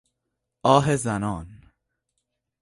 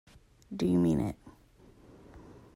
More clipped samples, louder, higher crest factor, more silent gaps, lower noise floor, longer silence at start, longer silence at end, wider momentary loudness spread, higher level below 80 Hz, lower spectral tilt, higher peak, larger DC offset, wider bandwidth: neither; first, -22 LUFS vs -30 LUFS; first, 24 dB vs 16 dB; neither; first, -81 dBFS vs -59 dBFS; first, 0.65 s vs 0.5 s; first, 1.05 s vs 0.25 s; second, 12 LU vs 26 LU; about the same, -52 dBFS vs -56 dBFS; second, -5.5 dB/octave vs -8 dB/octave; first, -2 dBFS vs -18 dBFS; neither; second, 11.5 kHz vs 15.5 kHz